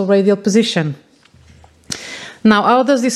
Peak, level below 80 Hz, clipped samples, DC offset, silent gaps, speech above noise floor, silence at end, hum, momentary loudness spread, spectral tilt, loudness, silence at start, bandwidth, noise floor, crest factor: 0 dBFS; -54 dBFS; under 0.1%; under 0.1%; none; 34 dB; 0 s; none; 16 LU; -5 dB/octave; -14 LUFS; 0 s; 12.5 kHz; -47 dBFS; 14 dB